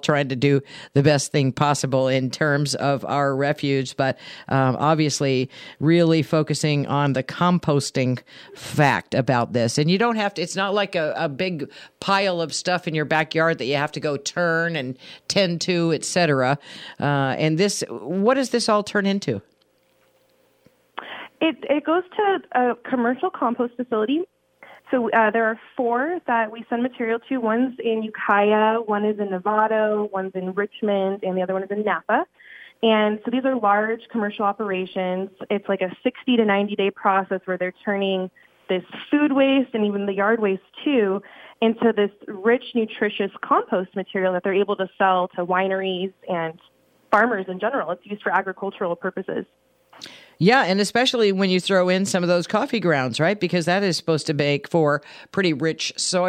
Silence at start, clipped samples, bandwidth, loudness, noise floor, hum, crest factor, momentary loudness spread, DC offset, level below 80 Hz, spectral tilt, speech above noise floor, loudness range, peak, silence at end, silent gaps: 0.05 s; under 0.1%; 14.5 kHz; -22 LUFS; -63 dBFS; none; 16 dB; 8 LU; under 0.1%; -66 dBFS; -5 dB/octave; 41 dB; 3 LU; -4 dBFS; 0 s; none